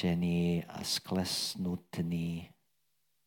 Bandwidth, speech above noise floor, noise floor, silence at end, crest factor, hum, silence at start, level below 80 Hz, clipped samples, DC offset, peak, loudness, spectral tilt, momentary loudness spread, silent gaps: 17 kHz; 47 dB; -80 dBFS; 0.8 s; 16 dB; none; 0 s; -60 dBFS; under 0.1%; under 0.1%; -20 dBFS; -34 LUFS; -5 dB/octave; 7 LU; none